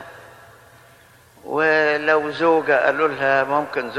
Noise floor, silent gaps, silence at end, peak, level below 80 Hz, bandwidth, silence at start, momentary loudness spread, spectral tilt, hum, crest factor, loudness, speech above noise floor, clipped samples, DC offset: -50 dBFS; none; 0 s; -4 dBFS; -64 dBFS; 13.5 kHz; 0 s; 5 LU; -5.5 dB/octave; none; 16 dB; -18 LUFS; 31 dB; under 0.1%; under 0.1%